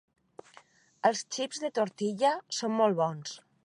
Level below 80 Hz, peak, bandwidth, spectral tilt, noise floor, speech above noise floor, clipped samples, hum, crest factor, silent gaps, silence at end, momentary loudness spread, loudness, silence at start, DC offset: -86 dBFS; -10 dBFS; 11.5 kHz; -4 dB/octave; -60 dBFS; 30 dB; under 0.1%; none; 20 dB; none; 0.3 s; 7 LU; -30 LUFS; 1.05 s; under 0.1%